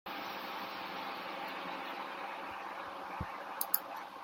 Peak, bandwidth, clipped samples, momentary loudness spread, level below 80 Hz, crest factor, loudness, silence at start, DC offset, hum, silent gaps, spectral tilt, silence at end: -12 dBFS; 16.5 kHz; under 0.1%; 9 LU; -68 dBFS; 30 dB; -40 LUFS; 0.05 s; under 0.1%; none; none; -2.5 dB/octave; 0 s